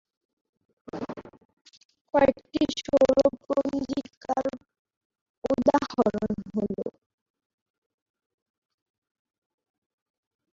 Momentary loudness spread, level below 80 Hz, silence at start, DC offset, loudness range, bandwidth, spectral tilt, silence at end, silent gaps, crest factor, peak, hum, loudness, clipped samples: 16 LU; -58 dBFS; 0.95 s; under 0.1%; 11 LU; 7.6 kHz; -6 dB/octave; 3.65 s; 1.45-1.65 s, 1.85-1.89 s, 2.01-2.05 s, 4.17-4.21 s, 4.79-4.85 s, 4.97-5.10 s, 5.21-5.42 s; 22 dB; -6 dBFS; none; -26 LUFS; under 0.1%